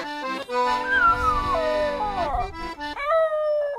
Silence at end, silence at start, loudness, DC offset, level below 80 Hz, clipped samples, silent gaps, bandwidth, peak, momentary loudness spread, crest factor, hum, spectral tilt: 0 s; 0 s; -23 LUFS; under 0.1%; -40 dBFS; under 0.1%; none; 14 kHz; -10 dBFS; 11 LU; 14 dB; none; -4.5 dB/octave